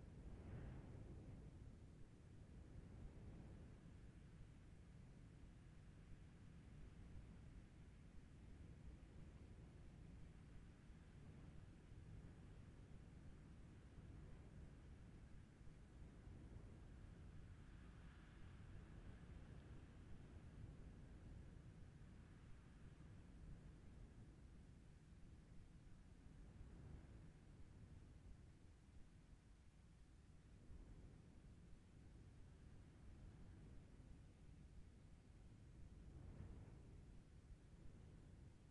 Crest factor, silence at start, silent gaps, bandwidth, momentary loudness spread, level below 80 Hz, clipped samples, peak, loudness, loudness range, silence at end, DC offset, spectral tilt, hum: 16 dB; 0 s; none; 10.5 kHz; 6 LU; -66 dBFS; under 0.1%; -46 dBFS; -64 LUFS; 4 LU; 0 s; under 0.1%; -7 dB/octave; none